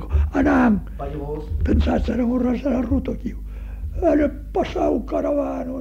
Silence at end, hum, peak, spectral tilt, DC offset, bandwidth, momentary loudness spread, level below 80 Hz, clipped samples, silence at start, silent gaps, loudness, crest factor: 0 s; none; -6 dBFS; -8.5 dB/octave; under 0.1%; 7.4 kHz; 13 LU; -28 dBFS; under 0.1%; 0 s; none; -21 LUFS; 14 dB